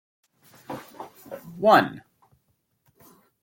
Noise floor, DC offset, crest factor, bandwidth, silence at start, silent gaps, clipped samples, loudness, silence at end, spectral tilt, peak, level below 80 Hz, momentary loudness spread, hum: -71 dBFS; under 0.1%; 24 dB; 17 kHz; 0.7 s; none; under 0.1%; -20 LUFS; 1.45 s; -5.5 dB/octave; -4 dBFS; -70 dBFS; 25 LU; none